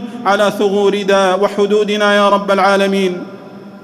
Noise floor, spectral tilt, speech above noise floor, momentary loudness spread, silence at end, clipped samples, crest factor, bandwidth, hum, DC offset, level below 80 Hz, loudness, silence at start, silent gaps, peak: -33 dBFS; -5 dB/octave; 20 dB; 7 LU; 0.05 s; under 0.1%; 12 dB; 14 kHz; none; under 0.1%; -60 dBFS; -13 LUFS; 0 s; none; 0 dBFS